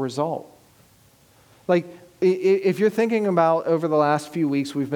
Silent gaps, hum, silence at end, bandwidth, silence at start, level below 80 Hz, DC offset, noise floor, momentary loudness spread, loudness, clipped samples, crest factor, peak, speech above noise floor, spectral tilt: none; none; 0 s; 18 kHz; 0 s; -72 dBFS; under 0.1%; -56 dBFS; 8 LU; -21 LUFS; under 0.1%; 16 dB; -6 dBFS; 35 dB; -7 dB/octave